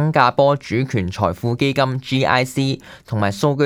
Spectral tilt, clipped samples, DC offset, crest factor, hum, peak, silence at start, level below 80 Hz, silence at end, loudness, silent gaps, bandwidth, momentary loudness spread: -6 dB/octave; under 0.1%; under 0.1%; 18 dB; none; 0 dBFS; 0 s; -50 dBFS; 0 s; -19 LUFS; none; 16 kHz; 7 LU